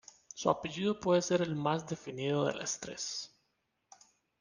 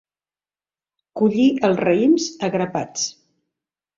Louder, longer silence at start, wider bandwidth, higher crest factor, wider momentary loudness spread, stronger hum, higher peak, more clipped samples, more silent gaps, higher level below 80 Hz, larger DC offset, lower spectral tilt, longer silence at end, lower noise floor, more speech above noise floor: second, -34 LUFS vs -19 LUFS; second, 0.35 s vs 1.15 s; first, 10.5 kHz vs 7.6 kHz; first, 24 dB vs 16 dB; about the same, 11 LU vs 9 LU; neither; second, -12 dBFS vs -4 dBFS; neither; neither; second, -70 dBFS vs -62 dBFS; neither; about the same, -4.5 dB/octave vs -5 dB/octave; first, 1.15 s vs 0.85 s; second, -80 dBFS vs under -90 dBFS; second, 47 dB vs over 72 dB